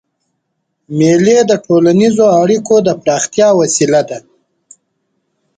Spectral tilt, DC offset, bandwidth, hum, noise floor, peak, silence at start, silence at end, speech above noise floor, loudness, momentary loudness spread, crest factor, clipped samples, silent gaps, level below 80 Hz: -5 dB/octave; under 0.1%; 9.6 kHz; none; -69 dBFS; 0 dBFS; 0.9 s; 1.4 s; 59 dB; -10 LUFS; 5 LU; 12 dB; under 0.1%; none; -54 dBFS